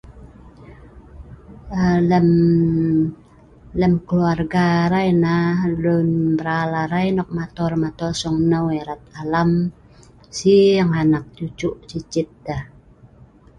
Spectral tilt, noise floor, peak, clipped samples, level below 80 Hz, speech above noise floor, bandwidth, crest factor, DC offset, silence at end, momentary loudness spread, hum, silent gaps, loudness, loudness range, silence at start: -7 dB/octave; -48 dBFS; -4 dBFS; under 0.1%; -44 dBFS; 30 dB; 9.2 kHz; 16 dB; under 0.1%; 0.9 s; 12 LU; none; none; -19 LUFS; 3 LU; 0.05 s